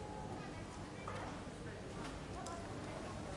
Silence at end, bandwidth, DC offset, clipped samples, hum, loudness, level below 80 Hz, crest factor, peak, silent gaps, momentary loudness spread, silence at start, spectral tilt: 0 s; 11.5 kHz; under 0.1%; under 0.1%; none; -48 LUFS; -58 dBFS; 16 dB; -30 dBFS; none; 3 LU; 0 s; -5 dB/octave